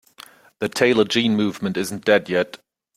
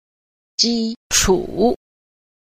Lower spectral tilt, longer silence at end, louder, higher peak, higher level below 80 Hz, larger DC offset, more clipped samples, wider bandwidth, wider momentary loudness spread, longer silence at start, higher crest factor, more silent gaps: first, -4.5 dB/octave vs -2.5 dB/octave; second, 0.4 s vs 0.7 s; about the same, -20 LUFS vs -18 LUFS; about the same, -2 dBFS vs -2 dBFS; second, -62 dBFS vs -36 dBFS; neither; neither; about the same, 16 kHz vs 15.5 kHz; about the same, 9 LU vs 11 LU; about the same, 0.6 s vs 0.6 s; about the same, 20 dB vs 18 dB; second, none vs 0.96-1.10 s